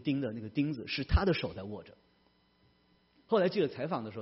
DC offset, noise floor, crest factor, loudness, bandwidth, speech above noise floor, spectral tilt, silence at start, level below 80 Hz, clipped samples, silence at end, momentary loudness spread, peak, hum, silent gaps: under 0.1%; -69 dBFS; 18 dB; -33 LUFS; 5.8 kHz; 37 dB; -5.5 dB/octave; 0 s; -42 dBFS; under 0.1%; 0 s; 12 LU; -16 dBFS; none; none